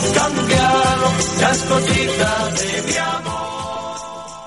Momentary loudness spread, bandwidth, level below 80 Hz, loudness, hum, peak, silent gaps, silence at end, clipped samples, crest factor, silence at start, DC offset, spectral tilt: 12 LU; 11.5 kHz; -38 dBFS; -17 LUFS; none; -2 dBFS; none; 0 s; under 0.1%; 16 dB; 0 s; 0.2%; -3.5 dB/octave